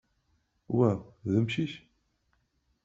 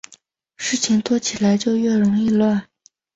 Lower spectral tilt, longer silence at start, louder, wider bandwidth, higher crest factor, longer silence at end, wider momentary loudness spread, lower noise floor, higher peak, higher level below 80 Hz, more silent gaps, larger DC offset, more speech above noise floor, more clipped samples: first, -7 dB/octave vs -4.5 dB/octave; about the same, 0.7 s vs 0.6 s; second, -30 LUFS vs -19 LUFS; about the same, 7.8 kHz vs 8 kHz; first, 20 dB vs 12 dB; first, 1.05 s vs 0.5 s; first, 9 LU vs 6 LU; first, -74 dBFS vs -53 dBFS; second, -12 dBFS vs -6 dBFS; second, -66 dBFS vs -58 dBFS; neither; neither; first, 46 dB vs 35 dB; neither